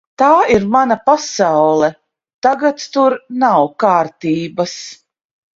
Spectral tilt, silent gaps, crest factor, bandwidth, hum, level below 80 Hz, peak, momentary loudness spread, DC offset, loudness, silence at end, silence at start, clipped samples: -5 dB/octave; 2.34-2.42 s; 14 dB; 7.8 kHz; none; -50 dBFS; 0 dBFS; 8 LU; under 0.1%; -14 LUFS; 0.65 s; 0.2 s; under 0.1%